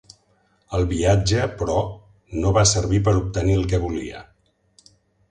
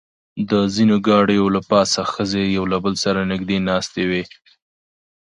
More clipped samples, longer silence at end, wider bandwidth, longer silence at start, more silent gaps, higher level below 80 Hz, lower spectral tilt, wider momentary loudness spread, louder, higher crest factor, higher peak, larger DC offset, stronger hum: neither; about the same, 1.1 s vs 1.05 s; about the same, 10.5 kHz vs 11 kHz; first, 0.7 s vs 0.35 s; neither; first, -34 dBFS vs -48 dBFS; about the same, -5 dB/octave vs -5 dB/octave; first, 14 LU vs 7 LU; second, -21 LUFS vs -18 LUFS; about the same, 18 dB vs 18 dB; second, -4 dBFS vs 0 dBFS; neither; neither